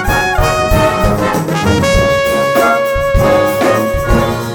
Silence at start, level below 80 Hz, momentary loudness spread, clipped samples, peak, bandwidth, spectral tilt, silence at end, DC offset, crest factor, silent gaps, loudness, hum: 0 s; -22 dBFS; 3 LU; under 0.1%; 0 dBFS; over 20 kHz; -5 dB/octave; 0 s; under 0.1%; 12 dB; none; -12 LUFS; none